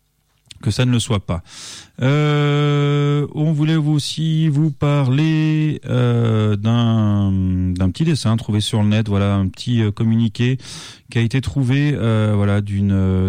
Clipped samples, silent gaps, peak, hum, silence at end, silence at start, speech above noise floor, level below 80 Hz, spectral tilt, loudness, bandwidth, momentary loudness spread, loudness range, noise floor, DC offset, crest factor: under 0.1%; none; -8 dBFS; none; 0 s; 0.65 s; 43 dB; -44 dBFS; -7 dB/octave; -18 LUFS; 11 kHz; 5 LU; 2 LU; -60 dBFS; under 0.1%; 10 dB